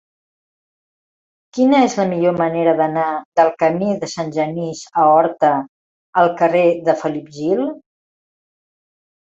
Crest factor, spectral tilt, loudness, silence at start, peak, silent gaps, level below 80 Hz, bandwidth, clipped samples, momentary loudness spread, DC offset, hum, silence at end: 16 dB; -6 dB/octave; -17 LUFS; 1.55 s; -2 dBFS; 3.25-3.32 s, 5.69-6.13 s; -64 dBFS; 7.8 kHz; under 0.1%; 10 LU; under 0.1%; none; 1.6 s